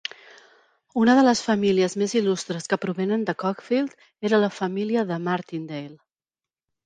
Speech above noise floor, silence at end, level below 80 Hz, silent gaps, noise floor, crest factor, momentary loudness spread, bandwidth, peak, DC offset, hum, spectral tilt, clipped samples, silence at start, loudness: over 67 dB; 0.9 s; -68 dBFS; none; under -90 dBFS; 18 dB; 14 LU; 9.8 kHz; -6 dBFS; under 0.1%; none; -5 dB/octave; under 0.1%; 0.95 s; -23 LUFS